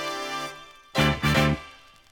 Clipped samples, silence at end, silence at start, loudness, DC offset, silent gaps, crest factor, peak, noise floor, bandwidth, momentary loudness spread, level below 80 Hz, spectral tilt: under 0.1%; 0.35 s; 0 s; -25 LUFS; under 0.1%; none; 20 dB; -8 dBFS; -48 dBFS; over 20 kHz; 18 LU; -42 dBFS; -5 dB/octave